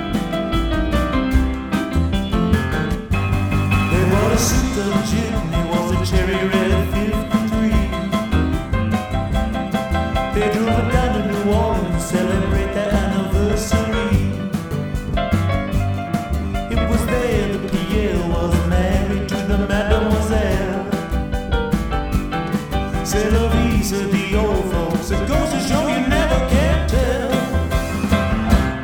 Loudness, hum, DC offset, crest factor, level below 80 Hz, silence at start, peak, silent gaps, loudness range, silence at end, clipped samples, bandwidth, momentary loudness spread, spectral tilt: -19 LUFS; none; under 0.1%; 18 dB; -24 dBFS; 0 s; 0 dBFS; none; 2 LU; 0 s; under 0.1%; 19.5 kHz; 5 LU; -6 dB/octave